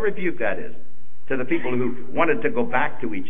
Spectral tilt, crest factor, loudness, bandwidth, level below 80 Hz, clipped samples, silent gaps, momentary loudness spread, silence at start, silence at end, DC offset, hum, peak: -10 dB/octave; 20 dB; -24 LUFS; 3.7 kHz; -62 dBFS; under 0.1%; none; 8 LU; 0 s; 0 s; 10%; none; -6 dBFS